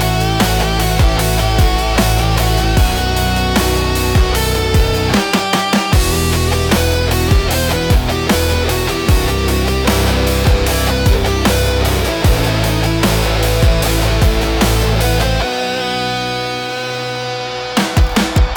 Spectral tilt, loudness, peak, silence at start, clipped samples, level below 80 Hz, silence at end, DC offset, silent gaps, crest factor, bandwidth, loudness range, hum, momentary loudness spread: -4.5 dB/octave; -14 LUFS; -2 dBFS; 0 s; under 0.1%; -18 dBFS; 0 s; under 0.1%; none; 12 dB; 19 kHz; 2 LU; none; 4 LU